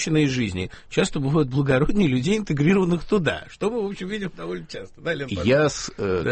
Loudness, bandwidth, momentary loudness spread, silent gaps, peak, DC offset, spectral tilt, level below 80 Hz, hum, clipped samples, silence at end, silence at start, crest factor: -23 LUFS; 8.8 kHz; 11 LU; none; -6 dBFS; under 0.1%; -6 dB/octave; -40 dBFS; none; under 0.1%; 0 s; 0 s; 16 dB